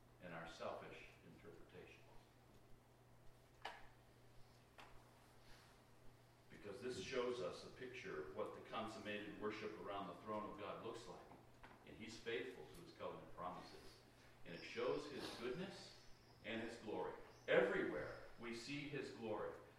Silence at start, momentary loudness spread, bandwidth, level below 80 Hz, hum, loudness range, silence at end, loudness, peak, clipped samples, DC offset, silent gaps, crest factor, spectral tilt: 0 s; 23 LU; 15.5 kHz; -74 dBFS; none; 18 LU; 0 s; -49 LUFS; -24 dBFS; under 0.1%; under 0.1%; none; 26 dB; -5 dB/octave